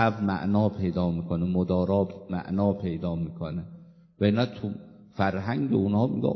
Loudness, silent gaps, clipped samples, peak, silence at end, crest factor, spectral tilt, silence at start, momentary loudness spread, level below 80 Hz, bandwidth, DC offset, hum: -27 LUFS; none; under 0.1%; -8 dBFS; 0 s; 18 dB; -9.5 dB/octave; 0 s; 10 LU; -48 dBFS; 6.2 kHz; under 0.1%; none